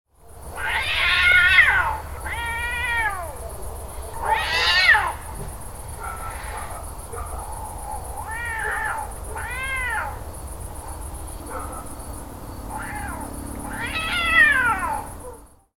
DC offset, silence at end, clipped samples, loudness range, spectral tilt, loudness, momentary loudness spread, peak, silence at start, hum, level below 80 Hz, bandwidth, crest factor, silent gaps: under 0.1%; 0.3 s; under 0.1%; 14 LU; -2.5 dB/octave; -20 LUFS; 21 LU; -2 dBFS; 0.25 s; none; -36 dBFS; 19 kHz; 22 dB; none